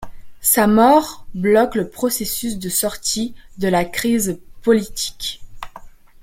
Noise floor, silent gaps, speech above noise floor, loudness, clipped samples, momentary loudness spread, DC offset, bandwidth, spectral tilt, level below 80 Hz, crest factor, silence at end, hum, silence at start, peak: -39 dBFS; none; 22 dB; -18 LUFS; under 0.1%; 15 LU; under 0.1%; 16.5 kHz; -3.5 dB/octave; -42 dBFS; 16 dB; 0.35 s; none; 0 s; -2 dBFS